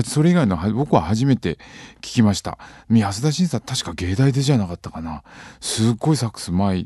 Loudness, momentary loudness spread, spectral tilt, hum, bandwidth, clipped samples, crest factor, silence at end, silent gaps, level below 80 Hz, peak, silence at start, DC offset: -20 LUFS; 15 LU; -6 dB/octave; none; 12.5 kHz; under 0.1%; 18 dB; 0 s; none; -40 dBFS; -2 dBFS; 0 s; under 0.1%